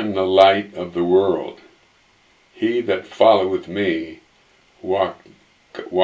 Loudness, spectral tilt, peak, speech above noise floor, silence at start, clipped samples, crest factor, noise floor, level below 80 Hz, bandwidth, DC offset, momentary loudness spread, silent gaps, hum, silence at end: -19 LUFS; -6.5 dB/octave; 0 dBFS; 38 dB; 0 s; under 0.1%; 20 dB; -56 dBFS; -54 dBFS; 8 kHz; under 0.1%; 20 LU; none; none; 0 s